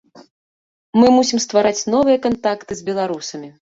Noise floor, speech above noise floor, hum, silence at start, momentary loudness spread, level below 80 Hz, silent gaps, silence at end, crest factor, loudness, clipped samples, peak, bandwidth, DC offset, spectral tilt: under -90 dBFS; over 74 dB; none; 0.95 s; 13 LU; -56 dBFS; none; 0.25 s; 16 dB; -17 LUFS; under 0.1%; -2 dBFS; 7.8 kHz; under 0.1%; -4 dB/octave